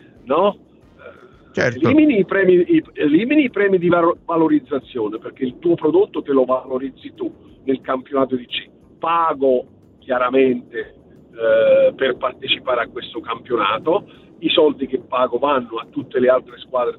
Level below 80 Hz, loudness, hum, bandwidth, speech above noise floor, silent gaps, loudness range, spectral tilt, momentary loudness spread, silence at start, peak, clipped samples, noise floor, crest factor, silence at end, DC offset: -58 dBFS; -18 LUFS; none; 6.6 kHz; 25 dB; none; 5 LU; -7 dB/octave; 13 LU; 0.25 s; 0 dBFS; under 0.1%; -43 dBFS; 18 dB; 0.05 s; under 0.1%